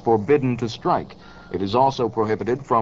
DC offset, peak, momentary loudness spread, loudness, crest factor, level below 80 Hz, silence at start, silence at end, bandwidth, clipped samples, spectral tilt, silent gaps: 0.3%; -6 dBFS; 9 LU; -22 LUFS; 16 dB; -52 dBFS; 0.05 s; 0 s; 7.6 kHz; under 0.1%; -7 dB/octave; none